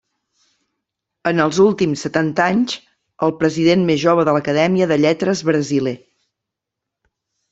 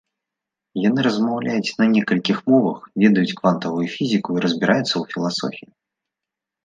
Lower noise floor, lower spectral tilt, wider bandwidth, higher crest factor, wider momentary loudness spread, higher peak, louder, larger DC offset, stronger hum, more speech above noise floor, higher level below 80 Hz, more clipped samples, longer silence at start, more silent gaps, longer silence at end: about the same, -82 dBFS vs -85 dBFS; about the same, -6 dB/octave vs -6 dB/octave; second, 8 kHz vs 9.2 kHz; about the same, 16 dB vs 18 dB; about the same, 7 LU vs 7 LU; about the same, -2 dBFS vs -2 dBFS; first, -17 LUFS vs -20 LUFS; neither; neither; about the same, 66 dB vs 66 dB; first, -58 dBFS vs -66 dBFS; neither; first, 1.25 s vs 0.75 s; neither; first, 1.55 s vs 1.05 s